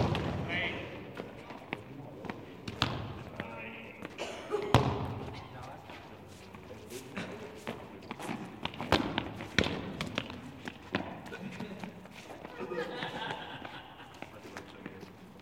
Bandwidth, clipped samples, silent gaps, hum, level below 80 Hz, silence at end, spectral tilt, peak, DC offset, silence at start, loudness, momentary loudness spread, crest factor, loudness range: 16.5 kHz; under 0.1%; none; none; -56 dBFS; 0 s; -5.5 dB/octave; -4 dBFS; under 0.1%; 0 s; -38 LUFS; 16 LU; 34 dB; 7 LU